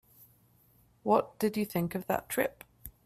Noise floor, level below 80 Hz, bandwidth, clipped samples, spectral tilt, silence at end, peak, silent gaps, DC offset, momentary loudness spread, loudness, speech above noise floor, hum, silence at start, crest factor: -65 dBFS; -64 dBFS; 16 kHz; under 0.1%; -5.5 dB/octave; 0.15 s; -10 dBFS; none; under 0.1%; 12 LU; -32 LUFS; 34 dB; none; 1.05 s; 22 dB